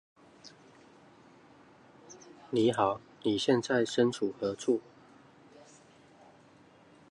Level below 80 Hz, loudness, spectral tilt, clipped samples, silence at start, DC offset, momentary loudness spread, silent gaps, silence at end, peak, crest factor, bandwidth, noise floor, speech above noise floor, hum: -72 dBFS; -30 LUFS; -5 dB/octave; under 0.1%; 0.45 s; under 0.1%; 26 LU; none; 2.3 s; -12 dBFS; 22 dB; 11.5 kHz; -59 dBFS; 30 dB; none